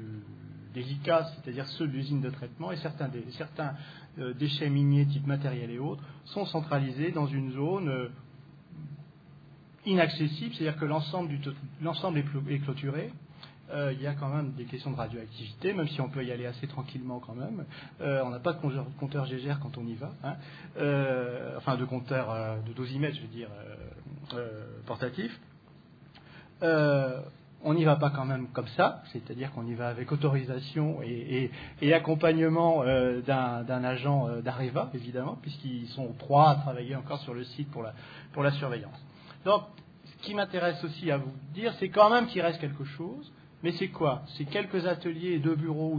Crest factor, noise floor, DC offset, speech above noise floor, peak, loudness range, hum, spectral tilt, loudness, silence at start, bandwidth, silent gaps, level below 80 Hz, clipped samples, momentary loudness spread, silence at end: 24 dB; -55 dBFS; under 0.1%; 25 dB; -8 dBFS; 7 LU; none; -9 dB/octave; -31 LUFS; 0 s; 5 kHz; none; -64 dBFS; under 0.1%; 16 LU; 0 s